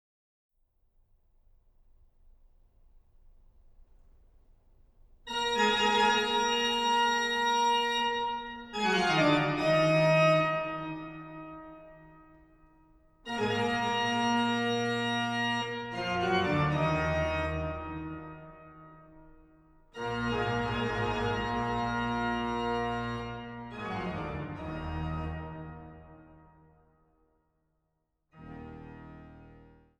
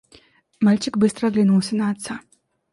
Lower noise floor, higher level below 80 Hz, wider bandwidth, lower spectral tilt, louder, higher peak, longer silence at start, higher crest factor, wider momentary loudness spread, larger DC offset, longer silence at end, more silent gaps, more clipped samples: first, -80 dBFS vs -54 dBFS; first, -52 dBFS vs -60 dBFS; first, 13 kHz vs 11.5 kHz; about the same, -5 dB/octave vs -6 dB/octave; second, -29 LUFS vs -20 LUFS; second, -12 dBFS vs -6 dBFS; first, 3.25 s vs 0.6 s; first, 20 dB vs 14 dB; first, 21 LU vs 12 LU; neither; second, 0.35 s vs 0.55 s; neither; neither